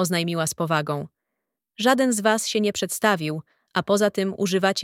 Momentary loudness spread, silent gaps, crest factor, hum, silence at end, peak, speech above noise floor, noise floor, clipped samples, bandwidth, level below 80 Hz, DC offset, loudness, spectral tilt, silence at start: 10 LU; none; 20 dB; none; 0 s; -4 dBFS; 60 dB; -82 dBFS; under 0.1%; 17 kHz; -66 dBFS; under 0.1%; -23 LUFS; -4 dB/octave; 0 s